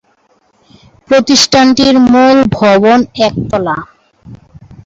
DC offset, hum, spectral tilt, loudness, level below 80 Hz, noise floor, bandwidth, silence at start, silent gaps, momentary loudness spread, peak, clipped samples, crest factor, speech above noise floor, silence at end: under 0.1%; none; -4 dB/octave; -8 LUFS; -40 dBFS; -53 dBFS; 7.8 kHz; 1.1 s; none; 9 LU; 0 dBFS; under 0.1%; 10 dB; 45 dB; 0.5 s